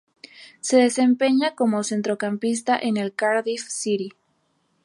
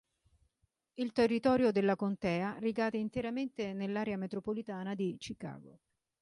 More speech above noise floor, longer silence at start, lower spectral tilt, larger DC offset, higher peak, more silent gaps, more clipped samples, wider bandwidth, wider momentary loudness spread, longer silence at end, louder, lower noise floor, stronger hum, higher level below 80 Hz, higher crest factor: about the same, 47 dB vs 45 dB; second, 0.4 s vs 1 s; second, -4 dB/octave vs -7 dB/octave; neither; first, -6 dBFS vs -18 dBFS; neither; neither; about the same, 11.5 kHz vs 11.5 kHz; second, 9 LU vs 14 LU; first, 0.75 s vs 0.5 s; first, -22 LUFS vs -34 LUFS; second, -68 dBFS vs -79 dBFS; neither; second, -76 dBFS vs -66 dBFS; about the same, 18 dB vs 18 dB